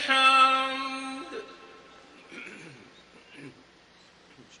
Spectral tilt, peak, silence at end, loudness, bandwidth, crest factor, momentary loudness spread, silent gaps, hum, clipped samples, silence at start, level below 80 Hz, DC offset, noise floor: -1.5 dB/octave; -8 dBFS; 1.1 s; -22 LUFS; 10.5 kHz; 20 dB; 29 LU; none; none; under 0.1%; 0 s; -74 dBFS; under 0.1%; -57 dBFS